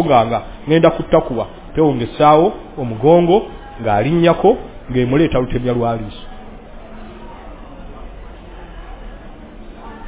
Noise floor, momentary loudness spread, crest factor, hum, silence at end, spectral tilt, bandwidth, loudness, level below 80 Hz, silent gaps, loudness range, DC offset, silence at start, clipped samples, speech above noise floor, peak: -34 dBFS; 25 LU; 16 dB; none; 0 s; -11 dB/octave; 4 kHz; -15 LUFS; -36 dBFS; none; 22 LU; under 0.1%; 0 s; under 0.1%; 20 dB; 0 dBFS